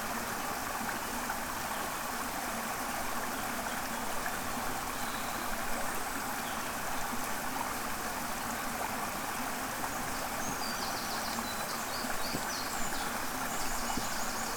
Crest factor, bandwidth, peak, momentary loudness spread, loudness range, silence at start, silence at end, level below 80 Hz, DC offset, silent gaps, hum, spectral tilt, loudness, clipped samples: 16 dB; over 20 kHz; -20 dBFS; 1 LU; 1 LU; 0 s; 0 s; -50 dBFS; under 0.1%; none; none; -2 dB/octave; -35 LUFS; under 0.1%